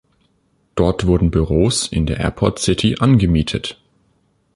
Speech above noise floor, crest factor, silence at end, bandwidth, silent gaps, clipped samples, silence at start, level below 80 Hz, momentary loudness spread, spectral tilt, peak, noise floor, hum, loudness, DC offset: 46 dB; 16 dB; 0.8 s; 11.5 kHz; none; under 0.1%; 0.75 s; -30 dBFS; 8 LU; -5.5 dB/octave; -2 dBFS; -62 dBFS; none; -17 LUFS; under 0.1%